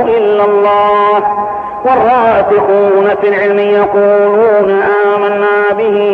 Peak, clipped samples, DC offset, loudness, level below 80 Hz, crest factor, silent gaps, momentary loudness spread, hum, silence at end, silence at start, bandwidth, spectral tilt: 0 dBFS; under 0.1%; under 0.1%; -9 LUFS; -48 dBFS; 8 dB; none; 3 LU; none; 0 s; 0 s; 4.6 kHz; -7.5 dB/octave